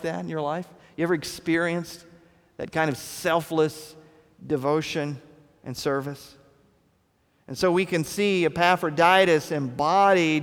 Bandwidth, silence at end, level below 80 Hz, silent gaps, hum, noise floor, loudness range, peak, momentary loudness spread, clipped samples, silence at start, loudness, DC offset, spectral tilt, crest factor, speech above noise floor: 19.5 kHz; 0 s; -60 dBFS; none; none; -66 dBFS; 9 LU; -4 dBFS; 20 LU; under 0.1%; 0 s; -24 LUFS; under 0.1%; -5 dB/octave; 20 dB; 42 dB